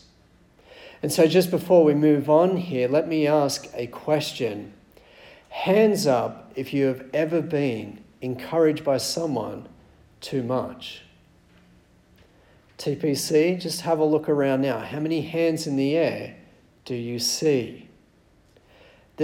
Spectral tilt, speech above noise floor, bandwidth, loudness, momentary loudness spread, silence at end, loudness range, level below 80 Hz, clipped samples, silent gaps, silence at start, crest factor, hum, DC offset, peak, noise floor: -5.5 dB/octave; 36 dB; 17.5 kHz; -23 LUFS; 16 LU; 0 s; 9 LU; -62 dBFS; under 0.1%; none; 0.75 s; 18 dB; none; under 0.1%; -6 dBFS; -58 dBFS